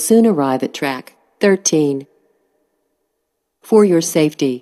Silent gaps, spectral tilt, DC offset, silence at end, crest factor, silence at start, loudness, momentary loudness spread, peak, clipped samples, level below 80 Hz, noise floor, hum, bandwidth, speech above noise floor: none; -4.5 dB/octave; under 0.1%; 0.05 s; 16 dB; 0 s; -15 LUFS; 10 LU; 0 dBFS; under 0.1%; -70 dBFS; -73 dBFS; none; 14.5 kHz; 58 dB